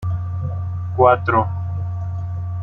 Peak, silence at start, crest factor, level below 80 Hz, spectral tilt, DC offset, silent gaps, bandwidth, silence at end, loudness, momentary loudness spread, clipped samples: -2 dBFS; 0 s; 18 dB; -44 dBFS; -10 dB/octave; under 0.1%; none; 4.1 kHz; 0 s; -20 LUFS; 12 LU; under 0.1%